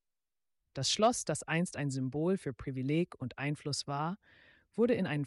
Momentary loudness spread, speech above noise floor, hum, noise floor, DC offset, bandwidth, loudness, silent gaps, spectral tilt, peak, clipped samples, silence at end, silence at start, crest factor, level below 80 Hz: 10 LU; 51 dB; none; -84 dBFS; under 0.1%; 11.5 kHz; -34 LUFS; none; -4.5 dB/octave; -18 dBFS; under 0.1%; 0 s; 0.75 s; 16 dB; -66 dBFS